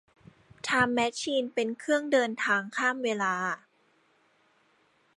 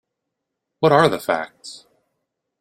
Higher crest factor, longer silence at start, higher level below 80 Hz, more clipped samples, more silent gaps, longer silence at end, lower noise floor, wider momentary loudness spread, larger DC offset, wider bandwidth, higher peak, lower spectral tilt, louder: about the same, 20 dB vs 22 dB; second, 0.65 s vs 0.8 s; second, -70 dBFS vs -60 dBFS; neither; neither; first, 1.6 s vs 0.85 s; second, -67 dBFS vs -80 dBFS; second, 6 LU vs 22 LU; neither; second, 11.5 kHz vs 16 kHz; second, -10 dBFS vs -2 dBFS; second, -3.5 dB/octave vs -5.5 dB/octave; second, -28 LUFS vs -18 LUFS